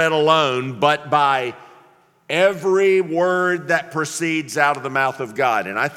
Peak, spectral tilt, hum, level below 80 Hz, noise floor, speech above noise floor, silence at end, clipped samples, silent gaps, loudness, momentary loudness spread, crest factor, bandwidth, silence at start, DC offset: 0 dBFS; -4 dB/octave; none; -70 dBFS; -53 dBFS; 35 dB; 0 s; under 0.1%; none; -18 LUFS; 6 LU; 18 dB; 15.5 kHz; 0 s; under 0.1%